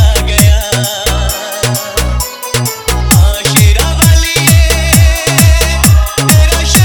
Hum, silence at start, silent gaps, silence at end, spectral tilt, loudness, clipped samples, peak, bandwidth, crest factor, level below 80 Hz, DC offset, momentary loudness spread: none; 0 s; none; 0 s; -4 dB/octave; -9 LUFS; 0.6%; 0 dBFS; 19.5 kHz; 8 dB; -12 dBFS; under 0.1%; 7 LU